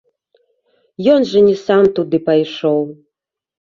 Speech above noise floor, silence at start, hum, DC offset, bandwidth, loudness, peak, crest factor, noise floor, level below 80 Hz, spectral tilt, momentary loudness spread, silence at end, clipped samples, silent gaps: 66 dB; 1 s; none; under 0.1%; 7.2 kHz; -14 LUFS; -2 dBFS; 14 dB; -79 dBFS; -58 dBFS; -7 dB/octave; 6 LU; 0.85 s; under 0.1%; none